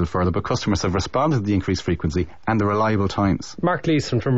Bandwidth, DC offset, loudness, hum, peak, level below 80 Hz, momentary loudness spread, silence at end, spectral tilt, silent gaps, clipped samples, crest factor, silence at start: 8 kHz; 1%; -22 LUFS; none; -8 dBFS; -38 dBFS; 3 LU; 0 s; -6.5 dB/octave; none; under 0.1%; 12 dB; 0 s